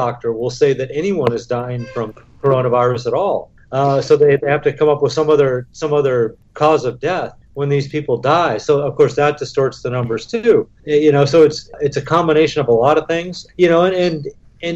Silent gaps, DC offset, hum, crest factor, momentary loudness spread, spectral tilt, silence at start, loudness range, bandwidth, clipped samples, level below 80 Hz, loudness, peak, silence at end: none; under 0.1%; none; 14 dB; 10 LU; -6.5 dB/octave; 0 s; 3 LU; 8 kHz; under 0.1%; -48 dBFS; -16 LUFS; -2 dBFS; 0 s